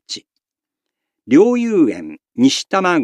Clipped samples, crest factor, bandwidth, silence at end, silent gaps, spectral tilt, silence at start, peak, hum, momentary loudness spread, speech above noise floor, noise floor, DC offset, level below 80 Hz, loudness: under 0.1%; 16 dB; 11.5 kHz; 0 s; none; -4.5 dB/octave; 0.1 s; 0 dBFS; none; 17 LU; 70 dB; -84 dBFS; under 0.1%; -70 dBFS; -15 LUFS